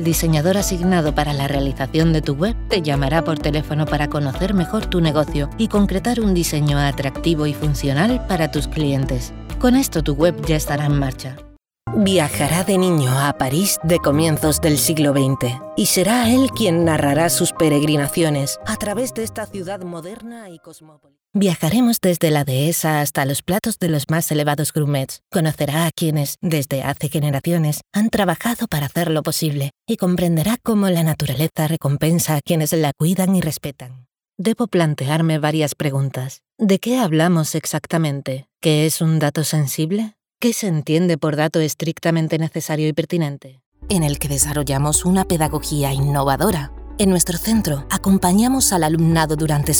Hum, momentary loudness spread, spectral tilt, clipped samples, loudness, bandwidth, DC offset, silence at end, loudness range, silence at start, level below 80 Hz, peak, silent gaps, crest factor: none; 7 LU; -5 dB/octave; under 0.1%; -18 LUFS; over 20 kHz; under 0.1%; 0 s; 4 LU; 0 s; -34 dBFS; -2 dBFS; 43.66-43.72 s; 18 dB